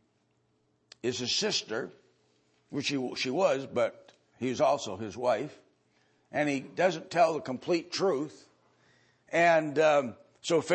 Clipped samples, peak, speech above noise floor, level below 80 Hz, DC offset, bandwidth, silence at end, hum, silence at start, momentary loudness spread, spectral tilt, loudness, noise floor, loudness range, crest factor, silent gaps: under 0.1%; -12 dBFS; 44 dB; -78 dBFS; under 0.1%; 8.8 kHz; 0 s; none; 1.05 s; 12 LU; -4 dB/octave; -29 LUFS; -72 dBFS; 4 LU; 20 dB; none